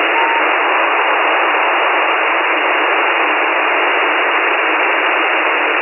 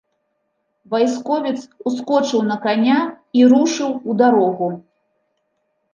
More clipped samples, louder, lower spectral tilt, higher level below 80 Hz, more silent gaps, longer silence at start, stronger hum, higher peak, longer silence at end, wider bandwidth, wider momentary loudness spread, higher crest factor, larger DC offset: neither; first, -12 LUFS vs -17 LUFS; second, -2 dB/octave vs -5 dB/octave; second, under -90 dBFS vs -70 dBFS; neither; second, 0 s vs 0.9 s; neither; about the same, -2 dBFS vs -2 dBFS; second, 0 s vs 1.15 s; second, 3.1 kHz vs 7.4 kHz; second, 1 LU vs 12 LU; second, 10 dB vs 16 dB; neither